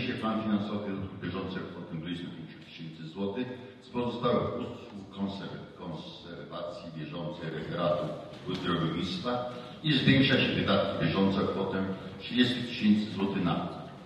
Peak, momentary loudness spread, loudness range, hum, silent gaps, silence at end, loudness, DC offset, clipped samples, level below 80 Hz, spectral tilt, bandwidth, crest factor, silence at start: -10 dBFS; 16 LU; 10 LU; none; none; 0 s; -31 LUFS; under 0.1%; under 0.1%; -56 dBFS; -7 dB/octave; 9.6 kHz; 22 dB; 0 s